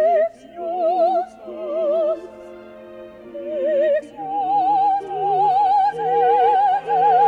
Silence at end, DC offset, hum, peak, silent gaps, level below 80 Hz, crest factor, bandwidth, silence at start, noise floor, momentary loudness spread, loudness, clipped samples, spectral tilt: 0 s; under 0.1%; 60 Hz at -65 dBFS; -8 dBFS; none; -62 dBFS; 12 dB; 5.2 kHz; 0 s; -39 dBFS; 22 LU; -19 LUFS; under 0.1%; -6 dB/octave